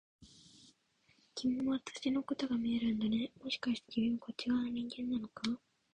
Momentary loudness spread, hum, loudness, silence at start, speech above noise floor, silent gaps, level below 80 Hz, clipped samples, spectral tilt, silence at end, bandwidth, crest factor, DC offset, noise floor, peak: 5 LU; none; -37 LUFS; 0.2 s; 36 dB; none; -70 dBFS; under 0.1%; -5 dB/octave; 0.35 s; 9.6 kHz; 18 dB; under 0.1%; -73 dBFS; -20 dBFS